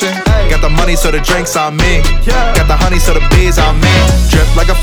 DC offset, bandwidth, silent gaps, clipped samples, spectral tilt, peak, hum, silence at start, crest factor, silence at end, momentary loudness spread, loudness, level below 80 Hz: under 0.1%; 17 kHz; none; under 0.1%; -4.5 dB/octave; 0 dBFS; none; 0 s; 8 dB; 0 s; 4 LU; -11 LUFS; -10 dBFS